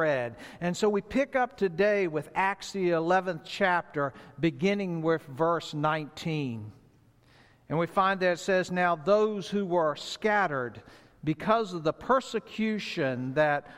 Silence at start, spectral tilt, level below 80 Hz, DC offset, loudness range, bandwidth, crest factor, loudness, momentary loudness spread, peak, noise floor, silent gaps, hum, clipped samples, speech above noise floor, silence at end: 0 s; -6 dB/octave; -62 dBFS; under 0.1%; 3 LU; 14.5 kHz; 18 dB; -28 LUFS; 8 LU; -10 dBFS; -60 dBFS; none; none; under 0.1%; 32 dB; 0 s